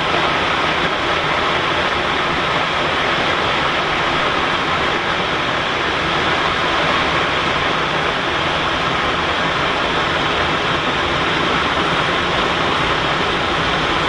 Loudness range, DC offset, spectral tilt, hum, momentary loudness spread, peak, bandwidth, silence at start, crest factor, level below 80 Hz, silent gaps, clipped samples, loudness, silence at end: 0 LU; under 0.1%; -4 dB/octave; none; 1 LU; -4 dBFS; 11.5 kHz; 0 s; 14 dB; -38 dBFS; none; under 0.1%; -16 LUFS; 0 s